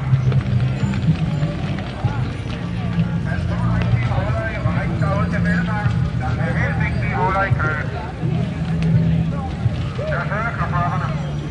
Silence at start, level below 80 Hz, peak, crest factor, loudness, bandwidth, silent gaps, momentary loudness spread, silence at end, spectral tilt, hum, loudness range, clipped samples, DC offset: 0 s; -32 dBFS; -6 dBFS; 14 dB; -20 LUFS; 9.4 kHz; none; 6 LU; 0 s; -8 dB/octave; none; 2 LU; under 0.1%; under 0.1%